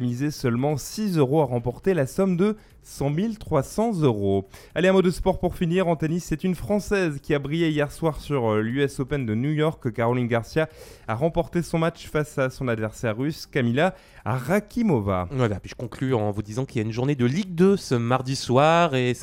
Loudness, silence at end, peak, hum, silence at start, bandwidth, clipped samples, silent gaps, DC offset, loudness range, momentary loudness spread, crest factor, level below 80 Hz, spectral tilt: -24 LUFS; 0 s; -6 dBFS; none; 0 s; 16.5 kHz; under 0.1%; none; under 0.1%; 2 LU; 7 LU; 18 dB; -46 dBFS; -6.5 dB/octave